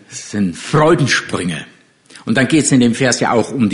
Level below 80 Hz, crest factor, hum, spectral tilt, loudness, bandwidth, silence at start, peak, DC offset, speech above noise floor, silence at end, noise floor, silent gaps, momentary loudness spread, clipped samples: -48 dBFS; 14 dB; none; -4.5 dB/octave; -14 LUFS; 11 kHz; 0.1 s; -2 dBFS; under 0.1%; 29 dB; 0 s; -43 dBFS; none; 11 LU; under 0.1%